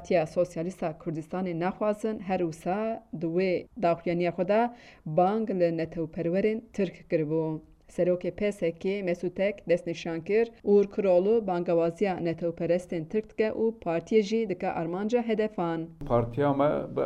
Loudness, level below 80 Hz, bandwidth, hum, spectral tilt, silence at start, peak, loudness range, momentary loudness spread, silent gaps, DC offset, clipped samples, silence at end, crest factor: -28 LUFS; -56 dBFS; 11.5 kHz; none; -7.5 dB/octave; 0 s; -12 dBFS; 3 LU; 8 LU; none; under 0.1%; under 0.1%; 0 s; 16 dB